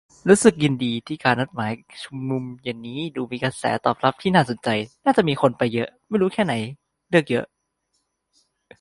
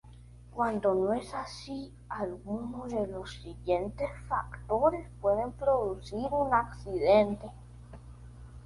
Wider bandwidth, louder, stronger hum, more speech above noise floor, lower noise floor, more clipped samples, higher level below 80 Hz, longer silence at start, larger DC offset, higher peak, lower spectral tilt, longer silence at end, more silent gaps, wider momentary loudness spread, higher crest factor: about the same, 11.5 kHz vs 11.5 kHz; first, -22 LUFS vs -31 LUFS; second, none vs 60 Hz at -45 dBFS; first, 52 dB vs 20 dB; first, -73 dBFS vs -51 dBFS; neither; second, -60 dBFS vs -50 dBFS; first, 0.25 s vs 0.05 s; neither; first, 0 dBFS vs -12 dBFS; about the same, -5.5 dB/octave vs -6.5 dB/octave; first, 1.35 s vs 0 s; neither; second, 12 LU vs 19 LU; about the same, 22 dB vs 20 dB